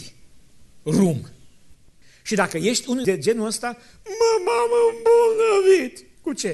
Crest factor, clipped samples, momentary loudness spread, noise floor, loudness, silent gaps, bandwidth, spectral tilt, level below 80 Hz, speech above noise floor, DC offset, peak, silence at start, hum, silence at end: 18 dB; under 0.1%; 16 LU; -51 dBFS; -20 LUFS; none; 12.5 kHz; -4.5 dB/octave; -56 dBFS; 31 dB; under 0.1%; -4 dBFS; 0 s; none; 0 s